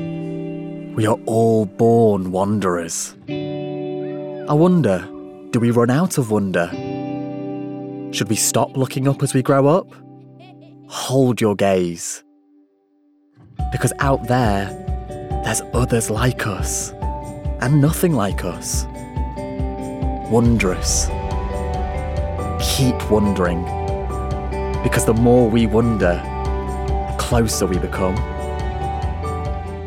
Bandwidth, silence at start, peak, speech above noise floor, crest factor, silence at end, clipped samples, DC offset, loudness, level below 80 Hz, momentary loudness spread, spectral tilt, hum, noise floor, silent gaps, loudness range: 17.5 kHz; 0 s; -4 dBFS; 41 dB; 16 dB; 0 s; under 0.1%; under 0.1%; -20 LUFS; -30 dBFS; 12 LU; -5.5 dB/octave; none; -58 dBFS; none; 4 LU